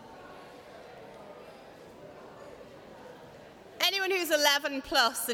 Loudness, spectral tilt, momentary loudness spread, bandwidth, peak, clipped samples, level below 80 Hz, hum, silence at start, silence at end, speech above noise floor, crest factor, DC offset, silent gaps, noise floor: -26 LUFS; -0.5 dB/octave; 25 LU; 20 kHz; -10 dBFS; under 0.1%; -66 dBFS; none; 0 s; 0 s; 23 dB; 24 dB; under 0.1%; none; -51 dBFS